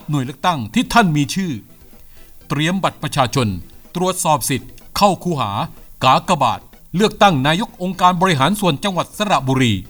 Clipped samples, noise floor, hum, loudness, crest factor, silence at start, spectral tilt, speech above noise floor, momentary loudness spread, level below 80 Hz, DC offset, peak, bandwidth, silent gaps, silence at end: under 0.1%; -41 dBFS; none; -17 LUFS; 18 dB; 0.1 s; -5 dB/octave; 24 dB; 11 LU; -42 dBFS; under 0.1%; 0 dBFS; over 20 kHz; none; 0 s